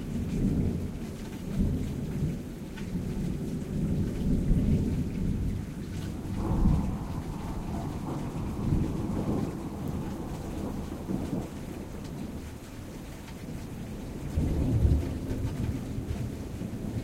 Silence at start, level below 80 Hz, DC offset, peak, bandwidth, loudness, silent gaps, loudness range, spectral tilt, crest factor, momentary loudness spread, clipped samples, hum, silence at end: 0 s; -36 dBFS; under 0.1%; -12 dBFS; 16 kHz; -33 LUFS; none; 7 LU; -8 dB/octave; 20 dB; 12 LU; under 0.1%; none; 0 s